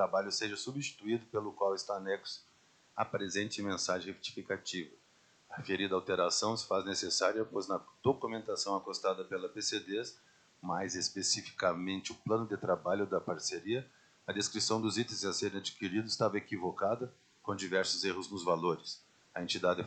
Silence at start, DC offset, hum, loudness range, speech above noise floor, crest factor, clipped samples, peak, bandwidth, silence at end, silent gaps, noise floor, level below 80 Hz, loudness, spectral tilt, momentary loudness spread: 0 s; under 0.1%; none; 4 LU; 32 dB; 20 dB; under 0.1%; -16 dBFS; 9.4 kHz; 0 s; none; -67 dBFS; -78 dBFS; -35 LUFS; -3 dB/octave; 9 LU